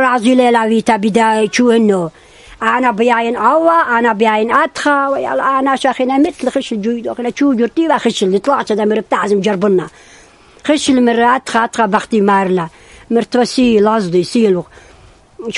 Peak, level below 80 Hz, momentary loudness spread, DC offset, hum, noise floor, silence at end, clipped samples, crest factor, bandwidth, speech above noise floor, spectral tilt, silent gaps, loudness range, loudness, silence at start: 0 dBFS; -50 dBFS; 7 LU; under 0.1%; none; -43 dBFS; 0 s; under 0.1%; 14 dB; 11.5 kHz; 31 dB; -5 dB/octave; none; 2 LU; -13 LUFS; 0 s